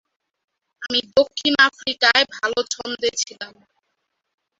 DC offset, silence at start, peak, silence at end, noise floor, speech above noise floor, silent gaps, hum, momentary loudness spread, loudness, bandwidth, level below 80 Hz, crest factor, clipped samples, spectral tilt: under 0.1%; 0.8 s; 0 dBFS; 1.1 s; -75 dBFS; 55 dB; none; none; 13 LU; -19 LUFS; 8 kHz; -62 dBFS; 22 dB; under 0.1%; -0.5 dB/octave